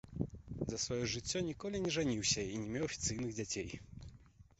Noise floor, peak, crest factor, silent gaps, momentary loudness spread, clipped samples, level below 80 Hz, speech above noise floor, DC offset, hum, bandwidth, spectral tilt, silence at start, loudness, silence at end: -61 dBFS; -22 dBFS; 18 dB; none; 13 LU; under 0.1%; -56 dBFS; 22 dB; under 0.1%; none; 8 kHz; -4.5 dB/octave; 0.05 s; -38 LUFS; 0.2 s